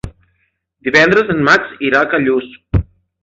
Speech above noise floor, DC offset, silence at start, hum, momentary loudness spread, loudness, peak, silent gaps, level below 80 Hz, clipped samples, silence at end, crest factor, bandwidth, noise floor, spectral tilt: 52 dB; under 0.1%; 0.05 s; none; 10 LU; -13 LUFS; 0 dBFS; none; -32 dBFS; under 0.1%; 0.4 s; 16 dB; 8 kHz; -64 dBFS; -6 dB/octave